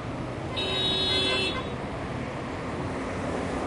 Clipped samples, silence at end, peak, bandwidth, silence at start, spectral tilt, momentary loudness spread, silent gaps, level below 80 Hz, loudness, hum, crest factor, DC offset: under 0.1%; 0 s; -14 dBFS; 11 kHz; 0 s; -4.5 dB/octave; 11 LU; none; -46 dBFS; -28 LUFS; none; 16 dB; under 0.1%